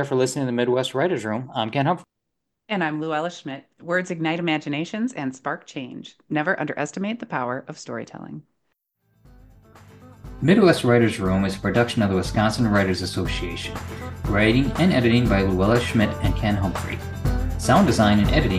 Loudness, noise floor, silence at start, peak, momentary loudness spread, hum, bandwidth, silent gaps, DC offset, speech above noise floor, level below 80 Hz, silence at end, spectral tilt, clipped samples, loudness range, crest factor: -22 LUFS; -80 dBFS; 0 s; -2 dBFS; 16 LU; none; 15.5 kHz; none; under 0.1%; 58 dB; -36 dBFS; 0 s; -6 dB/octave; under 0.1%; 8 LU; 20 dB